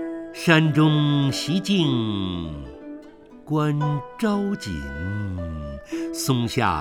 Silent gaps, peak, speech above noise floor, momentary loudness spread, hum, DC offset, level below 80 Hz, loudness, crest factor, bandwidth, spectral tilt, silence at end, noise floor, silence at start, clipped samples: none; -2 dBFS; 22 dB; 15 LU; none; under 0.1%; -44 dBFS; -23 LUFS; 20 dB; 16 kHz; -5.5 dB/octave; 0 s; -45 dBFS; 0 s; under 0.1%